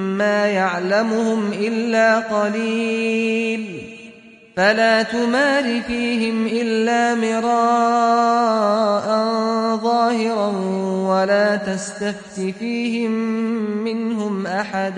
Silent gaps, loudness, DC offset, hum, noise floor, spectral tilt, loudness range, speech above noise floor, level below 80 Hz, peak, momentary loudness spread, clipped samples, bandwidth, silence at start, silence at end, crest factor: none; -19 LUFS; under 0.1%; none; -44 dBFS; -5 dB/octave; 3 LU; 25 dB; -60 dBFS; -4 dBFS; 8 LU; under 0.1%; 10.5 kHz; 0 s; 0 s; 16 dB